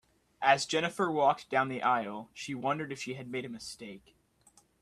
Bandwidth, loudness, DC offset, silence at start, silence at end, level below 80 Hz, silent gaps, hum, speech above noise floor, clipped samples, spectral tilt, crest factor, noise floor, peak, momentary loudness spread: 13.5 kHz; -31 LUFS; under 0.1%; 0.4 s; 0.85 s; -72 dBFS; none; none; 34 dB; under 0.1%; -4 dB/octave; 24 dB; -65 dBFS; -10 dBFS; 15 LU